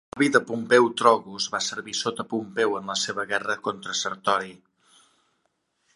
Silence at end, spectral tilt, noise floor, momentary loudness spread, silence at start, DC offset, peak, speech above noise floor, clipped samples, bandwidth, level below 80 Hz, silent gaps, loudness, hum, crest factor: 1.4 s; -3 dB/octave; -73 dBFS; 9 LU; 0.15 s; under 0.1%; -2 dBFS; 49 dB; under 0.1%; 11.5 kHz; -70 dBFS; none; -24 LUFS; none; 24 dB